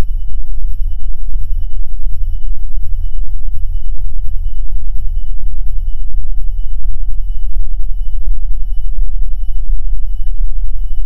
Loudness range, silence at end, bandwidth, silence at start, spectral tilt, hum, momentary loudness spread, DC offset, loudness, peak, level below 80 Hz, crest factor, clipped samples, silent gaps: 1 LU; 0 s; 0.2 kHz; 0 s; -7.5 dB/octave; none; 2 LU; under 0.1%; -25 LUFS; 0 dBFS; -14 dBFS; 4 dB; 1%; none